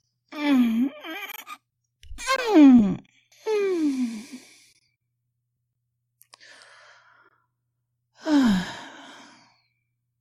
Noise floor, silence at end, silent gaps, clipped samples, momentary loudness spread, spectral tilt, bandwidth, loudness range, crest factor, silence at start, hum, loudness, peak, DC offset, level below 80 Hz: -78 dBFS; 1.3 s; none; under 0.1%; 26 LU; -5.5 dB/octave; 15 kHz; 11 LU; 20 dB; 0.3 s; none; -21 LUFS; -6 dBFS; under 0.1%; -54 dBFS